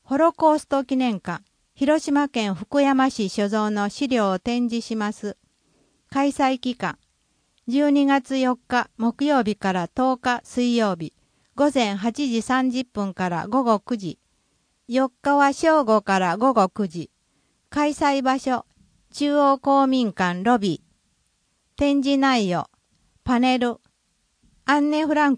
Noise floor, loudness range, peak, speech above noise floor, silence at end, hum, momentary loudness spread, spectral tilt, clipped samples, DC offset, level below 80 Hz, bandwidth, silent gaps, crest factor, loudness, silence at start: -69 dBFS; 3 LU; -6 dBFS; 48 dB; 0 s; none; 11 LU; -5 dB/octave; under 0.1%; under 0.1%; -56 dBFS; 10.5 kHz; none; 16 dB; -22 LUFS; 0.1 s